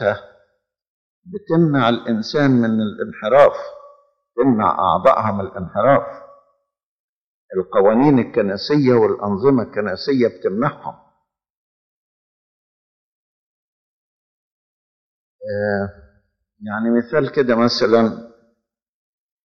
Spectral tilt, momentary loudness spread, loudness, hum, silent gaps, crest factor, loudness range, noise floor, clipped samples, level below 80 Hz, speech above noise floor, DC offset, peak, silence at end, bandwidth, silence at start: -7.5 dB/octave; 15 LU; -17 LUFS; none; 0.87-1.22 s, 6.86-7.49 s, 11.50-15.39 s; 18 dB; 12 LU; -70 dBFS; under 0.1%; -56 dBFS; 54 dB; under 0.1%; -2 dBFS; 1.2 s; 6.8 kHz; 0 s